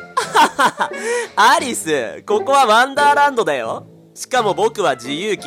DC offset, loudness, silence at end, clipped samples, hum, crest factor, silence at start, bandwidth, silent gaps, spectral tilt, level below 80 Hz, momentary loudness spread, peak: under 0.1%; -16 LUFS; 0 s; under 0.1%; none; 12 dB; 0 s; 16.5 kHz; none; -2.5 dB/octave; -62 dBFS; 9 LU; -4 dBFS